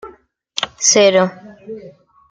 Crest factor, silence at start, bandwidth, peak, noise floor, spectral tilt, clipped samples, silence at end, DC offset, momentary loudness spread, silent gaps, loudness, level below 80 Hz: 16 dB; 0.05 s; 10.5 kHz; -2 dBFS; -46 dBFS; -2 dB/octave; under 0.1%; 0.4 s; under 0.1%; 23 LU; none; -14 LUFS; -62 dBFS